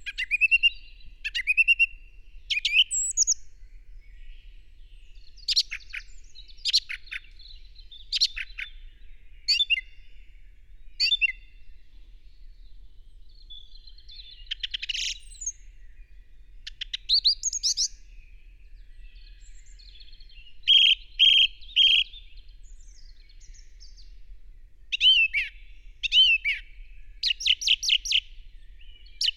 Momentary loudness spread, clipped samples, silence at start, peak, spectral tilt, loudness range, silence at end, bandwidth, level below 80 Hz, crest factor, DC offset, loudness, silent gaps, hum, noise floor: 19 LU; under 0.1%; 0.05 s; -10 dBFS; 4.5 dB/octave; 14 LU; 0.05 s; 16 kHz; -48 dBFS; 18 dB; under 0.1%; -22 LUFS; none; none; -47 dBFS